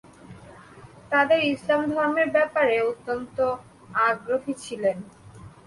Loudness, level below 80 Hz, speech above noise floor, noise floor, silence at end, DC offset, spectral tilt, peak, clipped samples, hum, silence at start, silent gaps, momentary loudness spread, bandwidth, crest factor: -24 LUFS; -60 dBFS; 24 dB; -47 dBFS; 0.2 s; under 0.1%; -5 dB/octave; -8 dBFS; under 0.1%; none; 0.3 s; none; 10 LU; 11.5 kHz; 16 dB